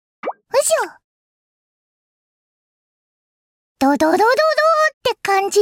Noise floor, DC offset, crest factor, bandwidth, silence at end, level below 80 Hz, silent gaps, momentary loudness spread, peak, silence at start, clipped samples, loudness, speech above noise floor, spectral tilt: under -90 dBFS; under 0.1%; 14 dB; 17 kHz; 0 s; -62 dBFS; 1.04-3.76 s, 4.94-5.01 s; 10 LU; -6 dBFS; 0.25 s; under 0.1%; -16 LUFS; over 75 dB; -2 dB/octave